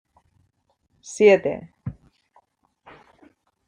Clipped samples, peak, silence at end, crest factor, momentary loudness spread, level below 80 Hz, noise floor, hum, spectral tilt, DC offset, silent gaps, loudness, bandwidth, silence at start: under 0.1%; -4 dBFS; 1.75 s; 22 dB; 21 LU; -60 dBFS; -69 dBFS; none; -5 dB/octave; under 0.1%; none; -19 LUFS; 9.8 kHz; 1.05 s